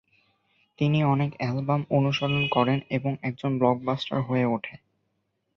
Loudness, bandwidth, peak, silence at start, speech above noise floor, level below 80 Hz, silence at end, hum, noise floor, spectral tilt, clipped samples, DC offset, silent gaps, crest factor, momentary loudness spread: -26 LUFS; 6.4 kHz; -6 dBFS; 0.8 s; 51 dB; -62 dBFS; 0.8 s; none; -76 dBFS; -8 dB/octave; under 0.1%; under 0.1%; none; 20 dB; 6 LU